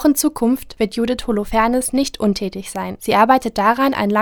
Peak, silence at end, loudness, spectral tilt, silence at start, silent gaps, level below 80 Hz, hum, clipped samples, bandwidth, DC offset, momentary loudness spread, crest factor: 0 dBFS; 0 s; -18 LUFS; -4.5 dB/octave; 0 s; none; -40 dBFS; none; under 0.1%; 20 kHz; under 0.1%; 9 LU; 16 dB